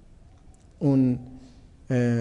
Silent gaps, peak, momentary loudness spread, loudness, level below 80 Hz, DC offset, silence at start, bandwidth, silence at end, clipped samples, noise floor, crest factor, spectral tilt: none; -12 dBFS; 11 LU; -25 LUFS; -52 dBFS; under 0.1%; 0.8 s; 9.8 kHz; 0 s; under 0.1%; -51 dBFS; 16 dB; -9 dB/octave